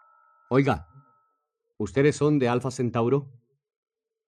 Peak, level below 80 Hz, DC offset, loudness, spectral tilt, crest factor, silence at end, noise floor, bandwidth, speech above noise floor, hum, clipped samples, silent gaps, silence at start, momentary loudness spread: -8 dBFS; -58 dBFS; under 0.1%; -25 LUFS; -7 dB/octave; 20 dB; 1 s; -78 dBFS; 10.5 kHz; 54 dB; none; under 0.1%; none; 0.5 s; 7 LU